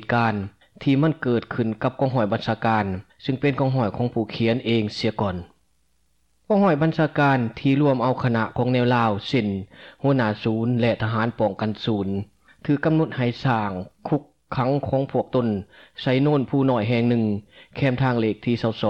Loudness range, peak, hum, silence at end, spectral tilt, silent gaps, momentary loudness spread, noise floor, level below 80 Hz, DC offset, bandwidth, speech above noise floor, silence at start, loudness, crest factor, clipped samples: 3 LU; -10 dBFS; none; 0 s; -8.5 dB/octave; none; 9 LU; -68 dBFS; -54 dBFS; under 0.1%; 7.8 kHz; 46 dB; 0 s; -23 LUFS; 12 dB; under 0.1%